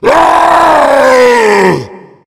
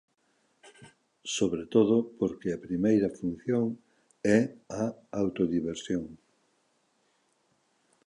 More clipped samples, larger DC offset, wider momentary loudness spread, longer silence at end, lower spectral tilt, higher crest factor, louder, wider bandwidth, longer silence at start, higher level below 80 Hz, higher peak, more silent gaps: first, 4% vs under 0.1%; neither; second, 4 LU vs 9 LU; second, 0.3 s vs 1.9 s; second, -4.5 dB/octave vs -6 dB/octave; second, 6 dB vs 22 dB; first, -6 LUFS vs -29 LUFS; first, 16.5 kHz vs 11 kHz; second, 0 s vs 0.65 s; first, -40 dBFS vs -62 dBFS; first, 0 dBFS vs -10 dBFS; neither